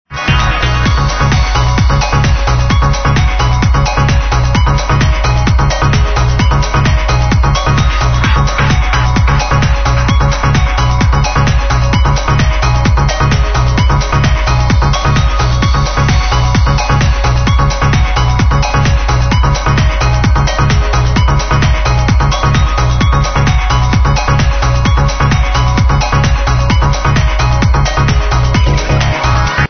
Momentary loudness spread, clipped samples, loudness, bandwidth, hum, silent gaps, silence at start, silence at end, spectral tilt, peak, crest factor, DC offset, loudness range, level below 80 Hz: 1 LU; under 0.1%; -11 LUFS; 6.6 kHz; none; none; 0.1 s; 0 s; -5.5 dB/octave; 0 dBFS; 10 dB; 0.3%; 0 LU; -12 dBFS